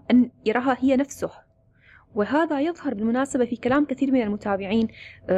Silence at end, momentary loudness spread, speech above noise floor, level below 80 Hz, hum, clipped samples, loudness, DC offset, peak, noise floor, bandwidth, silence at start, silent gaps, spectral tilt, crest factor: 0 s; 8 LU; 34 dB; -56 dBFS; none; under 0.1%; -24 LUFS; under 0.1%; -10 dBFS; -57 dBFS; 12.5 kHz; 0.1 s; none; -6 dB/octave; 14 dB